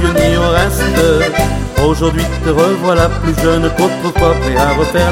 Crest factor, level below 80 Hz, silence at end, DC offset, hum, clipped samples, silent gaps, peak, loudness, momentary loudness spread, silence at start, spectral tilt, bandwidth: 12 dB; -20 dBFS; 0 s; under 0.1%; none; under 0.1%; none; 0 dBFS; -12 LUFS; 3 LU; 0 s; -5.5 dB/octave; 16.5 kHz